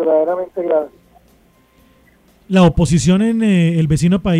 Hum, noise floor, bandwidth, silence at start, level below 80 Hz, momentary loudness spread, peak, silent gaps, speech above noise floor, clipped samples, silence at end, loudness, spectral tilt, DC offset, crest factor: none; -52 dBFS; 11.5 kHz; 0 s; -34 dBFS; 7 LU; -2 dBFS; none; 39 dB; under 0.1%; 0 s; -15 LUFS; -7 dB/octave; under 0.1%; 14 dB